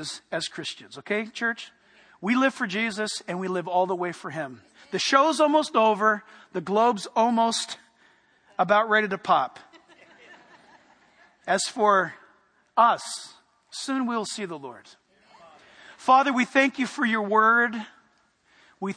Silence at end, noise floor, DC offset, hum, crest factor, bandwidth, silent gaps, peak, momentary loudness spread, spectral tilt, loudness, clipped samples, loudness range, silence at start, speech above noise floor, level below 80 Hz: 0 s; -65 dBFS; under 0.1%; none; 22 dB; 10.5 kHz; none; -2 dBFS; 16 LU; -3.5 dB/octave; -24 LUFS; under 0.1%; 5 LU; 0 s; 40 dB; -78 dBFS